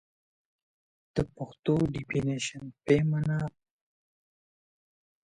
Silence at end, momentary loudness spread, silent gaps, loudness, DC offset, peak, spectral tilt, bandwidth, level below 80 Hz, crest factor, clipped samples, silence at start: 1.75 s; 10 LU; 1.59-1.63 s; -30 LUFS; under 0.1%; -10 dBFS; -6.5 dB/octave; 10 kHz; -56 dBFS; 22 dB; under 0.1%; 1.15 s